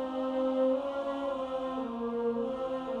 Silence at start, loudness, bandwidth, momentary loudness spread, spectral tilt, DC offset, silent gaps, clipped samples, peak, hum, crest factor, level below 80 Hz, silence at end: 0 s; -33 LUFS; 8.2 kHz; 6 LU; -6.5 dB/octave; under 0.1%; none; under 0.1%; -18 dBFS; none; 14 dB; -64 dBFS; 0 s